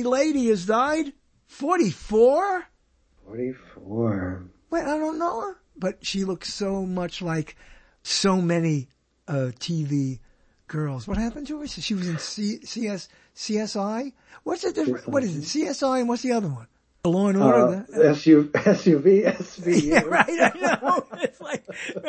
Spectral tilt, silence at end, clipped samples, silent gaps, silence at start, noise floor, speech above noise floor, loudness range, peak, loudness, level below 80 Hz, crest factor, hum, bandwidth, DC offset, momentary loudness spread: -5.5 dB/octave; 0 s; under 0.1%; none; 0 s; -62 dBFS; 39 dB; 10 LU; -2 dBFS; -23 LUFS; -50 dBFS; 22 dB; none; 8.8 kHz; under 0.1%; 15 LU